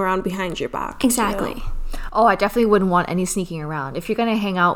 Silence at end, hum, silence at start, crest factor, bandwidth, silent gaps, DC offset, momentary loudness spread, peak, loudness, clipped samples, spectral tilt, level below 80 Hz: 0 s; none; 0 s; 18 dB; over 20 kHz; none; under 0.1%; 10 LU; -2 dBFS; -20 LUFS; under 0.1%; -5 dB/octave; -32 dBFS